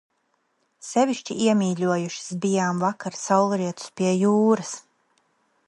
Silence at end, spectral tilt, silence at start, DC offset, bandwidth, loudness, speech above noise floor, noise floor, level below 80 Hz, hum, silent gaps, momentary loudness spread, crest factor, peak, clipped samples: 0.9 s; -5.5 dB/octave; 0.85 s; under 0.1%; 11.5 kHz; -23 LUFS; 48 dB; -71 dBFS; -72 dBFS; none; none; 10 LU; 20 dB; -4 dBFS; under 0.1%